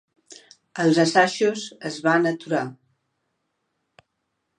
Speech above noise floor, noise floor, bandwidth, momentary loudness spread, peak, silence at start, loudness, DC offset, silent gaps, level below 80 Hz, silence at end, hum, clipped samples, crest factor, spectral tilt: 56 dB; -77 dBFS; 10.5 kHz; 14 LU; -2 dBFS; 0.3 s; -21 LUFS; under 0.1%; none; -76 dBFS; 1.85 s; none; under 0.1%; 22 dB; -5 dB/octave